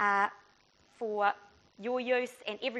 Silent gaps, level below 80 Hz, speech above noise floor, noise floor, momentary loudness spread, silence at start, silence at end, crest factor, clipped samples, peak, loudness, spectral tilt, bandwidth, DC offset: none; -78 dBFS; 34 dB; -66 dBFS; 11 LU; 0 s; 0 s; 20 dB; under 0.1%; -14 dBFS; -33 LUFS; -4 dB/octave; 11.5 kHz; under 0.1%